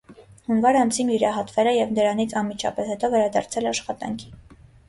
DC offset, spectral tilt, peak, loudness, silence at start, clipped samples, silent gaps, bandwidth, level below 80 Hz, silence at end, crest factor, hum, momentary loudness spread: under 0.1%; -4 dB/octave; -8 dBFS; -22 LUFS; 0.1 s; under 0.1%; none; 11.5 kHz; -56 dBFS; 0.5 s; 16 dB; none; 11 LU